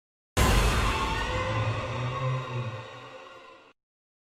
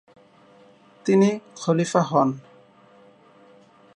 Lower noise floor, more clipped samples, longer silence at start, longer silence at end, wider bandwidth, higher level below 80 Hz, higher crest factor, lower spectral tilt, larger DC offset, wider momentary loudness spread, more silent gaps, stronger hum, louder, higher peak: about the same, -50 dBFS vs -53 dBFS; neither; second, 0.35 s vs 1.05 s; second, 0.65 s vs 1.55 s; first, 16 kHz vs 11 kHz; first, -34 dBFS vs -74 dBFS; about the same, 20 dB vs 20 dB; second, -4.5 dB/octave vs -6.5 dB/octave; neither; first, 20 LU vs 11 LU; neither; neither; second, -28 LUFS vs -22 LUFS; second, -10 dBFS vs -4 dBFS